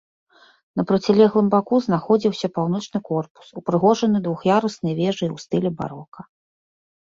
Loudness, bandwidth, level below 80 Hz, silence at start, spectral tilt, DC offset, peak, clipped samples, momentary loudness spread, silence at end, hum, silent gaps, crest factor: -21 LUFS; 7.6 kHz; -60 dBFS; 0.75 s; -7 dB/octave; under 0.1%; -2 dBFS; under 0.1%; 13 LU; 0.95 s; none; 3.30-3.35 s, 6.08-6.12 s; 18 dB